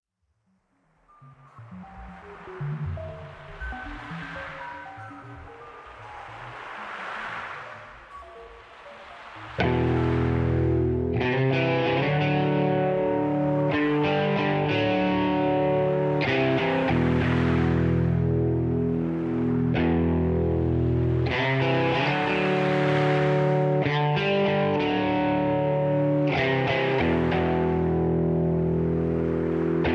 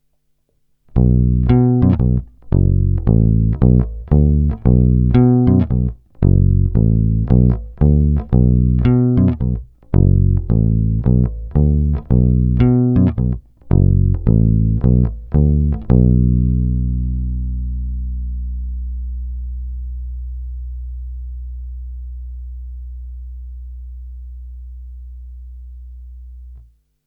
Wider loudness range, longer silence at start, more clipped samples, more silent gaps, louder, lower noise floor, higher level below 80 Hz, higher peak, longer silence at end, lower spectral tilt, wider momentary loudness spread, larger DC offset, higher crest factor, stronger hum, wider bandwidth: second, 15 LU vs 18 LU; first, 1.25 s vs 0.95 s; neither; neither; second, -24 LUFS vs -16 LUFS; first, -72 dBFS vs -63 dBFS; second, -42 dBFS vs -20 dBFS; second, -8 dBFS vs 0 dBFS; second, 0 s vs 0.45 s; second, -8.5 dB/octave vs -13.5 dB/octave; about the same, 19 LU vs 20 LU; neither; about the same, 16 dB vs 14 dB; neither; first, 7.6 kHz vs 3.5 kHz